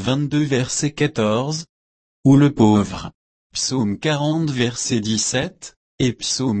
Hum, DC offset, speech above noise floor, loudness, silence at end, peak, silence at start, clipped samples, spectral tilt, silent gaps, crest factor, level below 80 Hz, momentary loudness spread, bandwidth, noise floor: none; under 0.1%; over 71 dB; -19 LUFS; 0 s; -4 dBFS; 0 s; under 0.1%; -5 dB/octave; 1.69-2.23 s, 3.14-3.50 s, 5.76-5.98 s; 16 dB; -50 dBFS; 14 LU; 8.8 kHz; under -90 dBFS